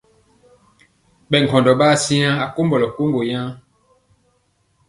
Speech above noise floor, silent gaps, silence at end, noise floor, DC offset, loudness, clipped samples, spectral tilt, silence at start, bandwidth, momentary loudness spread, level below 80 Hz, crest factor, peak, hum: 47 dB; none; 1.3 s; -63 dBFS; under 0.1%; -17 LUFS; under 0.1%; -5 dB/octave; 1.3 s; 11.5 kHz; 9 LU; -56 dBFS; 20 dB; 0 dBFS; none